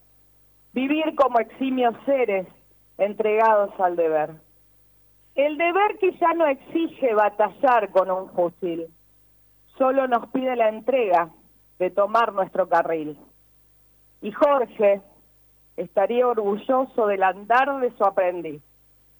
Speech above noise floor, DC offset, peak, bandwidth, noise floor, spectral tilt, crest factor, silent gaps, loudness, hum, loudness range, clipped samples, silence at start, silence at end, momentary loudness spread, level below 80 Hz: 36 dB; under 0.1%; -8 dBFS; over 20 kHz; -57 dBFS; -6.5 dB/octave; 14 dB; none; -22 LUFS; 50 Hz at -65 dBFS; 3 LU; under 0.1%; 0.75 s; 0.6 s; 10 LU; -66 dBFS